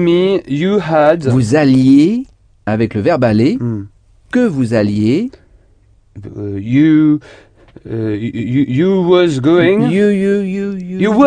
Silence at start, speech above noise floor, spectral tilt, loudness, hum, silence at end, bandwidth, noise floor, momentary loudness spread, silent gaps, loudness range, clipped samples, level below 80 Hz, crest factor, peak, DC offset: 0 s; 37 dB; -7.5 dB/octave; -13 LUFS; none; 0 s; 10 kHz; -49 dBFS; 12 LU; none; 4 LU; under 0.1%; -46 dBFS; 12 dB; 0 dBFS; under 0.1%